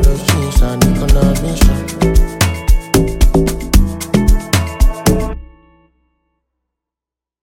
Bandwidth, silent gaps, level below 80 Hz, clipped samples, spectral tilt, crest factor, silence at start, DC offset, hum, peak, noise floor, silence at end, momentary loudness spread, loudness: 17 kHz; none; -14 dBFS; under 0.1%; -5.5 dB/octave; 12 dB; 0 s; under 0.1%; none; 0 dBFS; -87 dBFS; 2 s; 4 LU; -14 LUFS